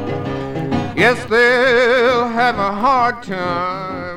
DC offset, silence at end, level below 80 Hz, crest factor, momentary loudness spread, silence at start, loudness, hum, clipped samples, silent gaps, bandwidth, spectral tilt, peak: under 0.1%; 0 s; -44 dBFS; 16 dB; 11 LU; 0 s; -16 LUFS; none; under 0.1%; none; 14 kHz; -5.5 dB/octave; 0 dBFS